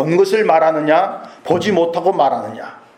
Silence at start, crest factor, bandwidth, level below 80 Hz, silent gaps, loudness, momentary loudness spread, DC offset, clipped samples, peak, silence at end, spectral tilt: 0 s; 14 dB; 14.5 kHz; -62 dBFS; none; -15 LUFS; 13 LU; under 0.1%; under 0.1%; 0 dBFS; 0.2 s; -6 dB/octave